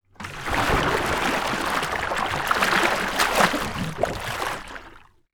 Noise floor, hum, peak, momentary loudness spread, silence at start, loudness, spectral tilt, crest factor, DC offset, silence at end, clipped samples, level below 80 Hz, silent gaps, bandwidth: -48 dBFS; none; -2 dBFS; 11 LU; 0.2 s; -23 LUFS; -3.5 dB/octave; 22 dB; under 0.1%; 0.35 s; under 0.1%; -40 dBFS; none; over 20 kHz